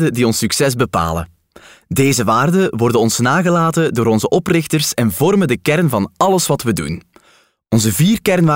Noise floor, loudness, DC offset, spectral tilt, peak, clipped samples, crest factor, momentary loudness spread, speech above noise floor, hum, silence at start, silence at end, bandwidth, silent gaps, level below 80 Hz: -53 dBFS; -15 LUFS; under 0.1%; -5 dB/octave; -2 dBFS; under 0.1%; 12 dB; 6 LU; 39 dB; none; 0 s; 0 s; 16.5 kHz; none; -46 dBFS